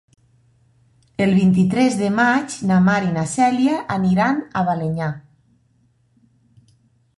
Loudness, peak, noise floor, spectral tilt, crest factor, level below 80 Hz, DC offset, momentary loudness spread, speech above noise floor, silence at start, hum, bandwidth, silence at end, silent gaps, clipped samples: -18 LUFS; -4 dBFS; -60 dBFS; -6.5 dB/octave; 16 dB; -52 dBFS; under 0.1%; 7 LU; 43 dB; 1.2 s; none; 11.5 kHz; 2 s; none; under 0.1%